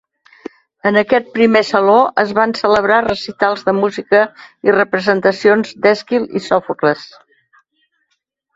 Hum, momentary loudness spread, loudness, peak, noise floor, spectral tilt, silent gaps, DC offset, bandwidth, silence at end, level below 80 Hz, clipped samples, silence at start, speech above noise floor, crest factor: none; 8 LU; -14 LUFS; 0 dBFS; -69 dBFS; -5.5 dB/octave; none; under 0.1%; 7.8 kHz; 1.5 s; -54 dBFS; under 0.1%; 0.85 s; 55 dB; 16 dB